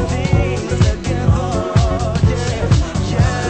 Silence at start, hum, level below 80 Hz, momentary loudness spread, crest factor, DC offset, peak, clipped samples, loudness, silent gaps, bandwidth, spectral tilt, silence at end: 0 s; none; -22 dBFS; 2 LU; 14 dB; under 0.1%; 0 dBFS; under 0.1%; -17 LUFS; none; 8.8 kHz; -6.5 dB/octave; 0 s